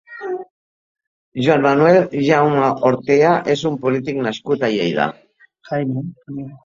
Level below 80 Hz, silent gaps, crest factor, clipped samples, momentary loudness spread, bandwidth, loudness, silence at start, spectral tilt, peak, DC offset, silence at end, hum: -58 dBFS; 0.50-0.95 s, 1.07-1.32 s; 16 dB; under 0.1%; 14 LU; 7.6 kHz; -17 LUFS; 0.1 s; -6.5 dB/octave; 0 dBFS; under 0.1%; 0.1 s; none